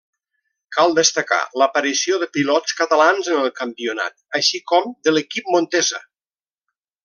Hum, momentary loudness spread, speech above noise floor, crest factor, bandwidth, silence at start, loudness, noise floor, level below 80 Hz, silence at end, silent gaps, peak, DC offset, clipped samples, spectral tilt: none; 9 LU; over 72 dB; 18 dB; 11 kHz; 0.7 s; -18 LUFS; under -90 dBFS; -72 dBFS; 1.05 s; none; 0 dBFS; under 0.1%; under 0.1%; -2 dB/octave